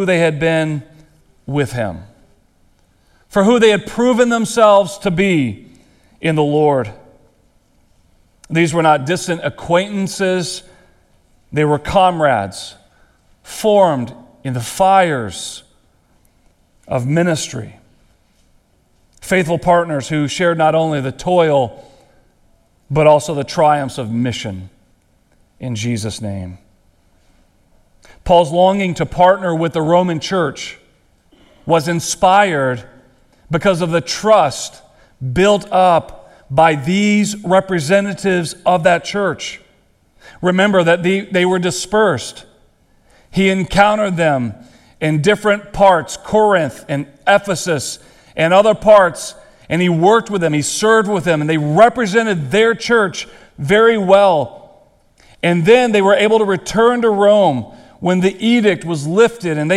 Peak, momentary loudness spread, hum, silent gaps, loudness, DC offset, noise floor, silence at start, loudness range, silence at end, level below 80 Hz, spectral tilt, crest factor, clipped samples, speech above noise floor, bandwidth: 0 dBFS; 14 LU; none; none; -14 LUFS; under 0.1%; -56 dBFS; 0 s; 6 LU; 0 s; -44 dBFS; -5 dB/octave; 16 dB; under 0.1%; 42 dB; 14.5 kHz